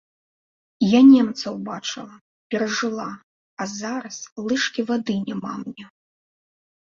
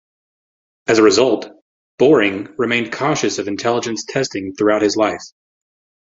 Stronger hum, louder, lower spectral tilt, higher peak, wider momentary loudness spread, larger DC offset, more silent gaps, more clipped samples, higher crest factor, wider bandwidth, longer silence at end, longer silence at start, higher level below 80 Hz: neither; second, -21 LUFS vs -17 LUFS; about the same, -4.5 dB/octave vs -4 dB/octave; about the same, -4 dBFS vs -2 dBFS; first, 21 LU vs 10 LU; neither; first, 2.21-2.50 s, 3.23-3.57 s, 4.32-4.36 s vs 1.62-1.98 s; neither; about the same, 18 dB vs 16 dB; about the same, 7.4 kHz vs 7.8 kHz; first, 0.95 s vs 0.75 s; about the same, 0.8 s vs 0.9 s; second, -66 dBFS vs -56 dBFS